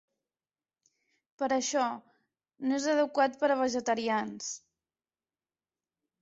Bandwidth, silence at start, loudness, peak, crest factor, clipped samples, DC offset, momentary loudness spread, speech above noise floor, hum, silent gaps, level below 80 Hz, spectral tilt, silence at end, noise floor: 8 kHz; 1.4 s; -30 LUFS; -14 dBFS; 18 dB; under 0.1%; under 0.1%; 11 LU; over 61 dB; none; none; -76 dBFS; -2.5 dB/octave; 1.65 s; under -90 dBFS